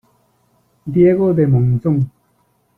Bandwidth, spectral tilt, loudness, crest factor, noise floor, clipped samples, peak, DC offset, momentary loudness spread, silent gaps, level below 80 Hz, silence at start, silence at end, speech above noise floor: 3.1 kHz; -12 dB/octave; -15 LUFS; 14 dB; -61 dBFS; under 0.1%; -2 dBFS; under 0.1%; 11 LU; none; -46 dBFS; 0.85 s; 0.7 s; 47 dB